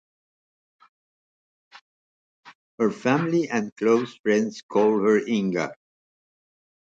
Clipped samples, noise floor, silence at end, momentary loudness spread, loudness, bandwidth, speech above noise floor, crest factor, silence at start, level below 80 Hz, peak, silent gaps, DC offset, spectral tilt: under 0.1%; under -90 dBFS; 1.2 s; 6 LU; -23 LUFS; 7.8 kHz; over 68 dB; 18 dB; 2.45 s; -72 dBFS; -8 dBFS; 2.55-2.78 s, 3.72-3.76 s, 4.19-4.24 s, 4.63-4.69 s; under 0.1%; -6 dB/octave